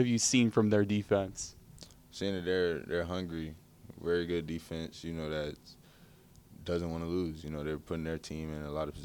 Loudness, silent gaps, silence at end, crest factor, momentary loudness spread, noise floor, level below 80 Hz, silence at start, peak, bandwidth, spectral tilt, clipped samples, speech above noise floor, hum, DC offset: -34 LUFS; none; 0 s; 20 dB; 18 LU; -59 dBFS; -58 dBFS; 0 s; -14 dBFS; 19 kHz; -5 dB/octave; under 0.1%; 26 dB; none; under 0.1%